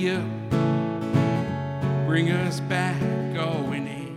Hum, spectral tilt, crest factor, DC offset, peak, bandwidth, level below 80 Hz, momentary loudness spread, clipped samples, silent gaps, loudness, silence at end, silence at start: none; -7 dB/octave; 16 dB; under 0.1%; -8 dBFS; 12 kHz; -54 dBFS; 6 LU; under 0.1%; none; -25 LUFS; 0 s; 0 s